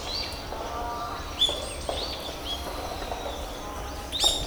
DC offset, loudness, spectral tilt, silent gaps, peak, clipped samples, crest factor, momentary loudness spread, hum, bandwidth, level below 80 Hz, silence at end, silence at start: under 0.1%; -30 LUFS; -2.5 dB/octave; none; -10 dBFS; under 0.1%; 22 dB; 11 LU; none; over 20 kHz; -40 dBFS; 0 s; 0 s